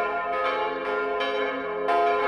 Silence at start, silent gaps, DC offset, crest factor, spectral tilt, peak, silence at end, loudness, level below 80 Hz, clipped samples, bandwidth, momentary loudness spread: 0 s; none; under 0.1%; 14 dB; -4.5 dB/octave; -12 dBFS; 0 s; -26 LUFS; -60 dBFS; under 0.1%; 10.5 kHz; 4 LU